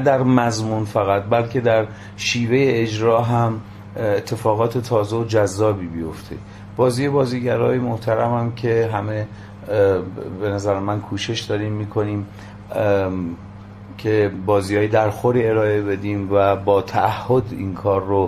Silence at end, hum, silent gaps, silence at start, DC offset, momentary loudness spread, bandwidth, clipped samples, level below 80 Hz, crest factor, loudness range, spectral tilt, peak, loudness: 0 s; none; none; 0 s; under 0.1%; 12 LU; 14.5 kHz; under 0.1%; -44 dBFS; 16 dB; 4 LU; -6.5 dB/octave; -2 dBFS; -20 LUFS